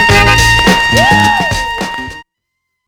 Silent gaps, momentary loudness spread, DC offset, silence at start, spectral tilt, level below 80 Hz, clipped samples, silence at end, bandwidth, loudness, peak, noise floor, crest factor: none; 13 LU; under 0.1%; 0 s; -3.5 dB/octave; -22 dBFS; 0.5%; 0.65 s; over 20 kHz; -8 LUFS; 0 dBFS; -72 dBFS; 10 dB